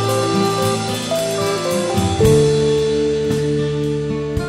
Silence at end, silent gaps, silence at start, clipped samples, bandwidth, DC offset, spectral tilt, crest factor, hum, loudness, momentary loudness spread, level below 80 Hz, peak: 0 s; none; 0 s; under 0.1%; 16 kHz; under 0.1%; -5.5 dB/octave; 16 dB; none; -17 LUFS; 7 LU; -36 dBFS; 0 dBFS